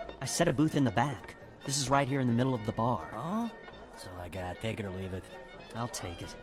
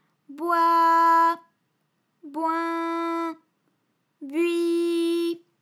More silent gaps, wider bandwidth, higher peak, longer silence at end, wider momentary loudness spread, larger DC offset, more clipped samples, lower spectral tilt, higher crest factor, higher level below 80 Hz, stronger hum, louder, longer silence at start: neither; first, 16 kHz vs 14 kHz; second, -14 dBFS vs -10 dBFS; second, 0 s vs 0.25 s; about the same, 17 LU vs 15 LU; neither; neither; first, -5 dB/octave vs -2.5 dB/octave; about the same, 20 dB vs 16 dB; first, -56 dBFS vs under -90 dBFS; neither; second, -32 LUFS vs -23 LUFS; second, 0 s vs 0.3 s